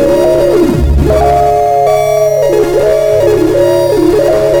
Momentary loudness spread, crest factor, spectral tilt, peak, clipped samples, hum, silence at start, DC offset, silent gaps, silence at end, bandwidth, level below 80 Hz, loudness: 1 LU; 8 dB; -6.5 dB/octave; 0 dBFS; under 0.1%; none; 0 s; under 0.1%; none; 0 s; over 20 kHz; -20 dBFS; -9 LUFS